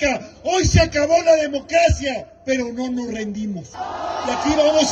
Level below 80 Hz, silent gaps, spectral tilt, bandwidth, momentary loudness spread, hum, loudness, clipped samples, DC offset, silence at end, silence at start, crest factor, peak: -32 dBFS; none; -4.5 dB/octave; 9.6 kHz; 12 LU; none; -19 LUFS; under 0.1%; under 0.1%; 0 s; 0 s; 16 dB; -2 dBFS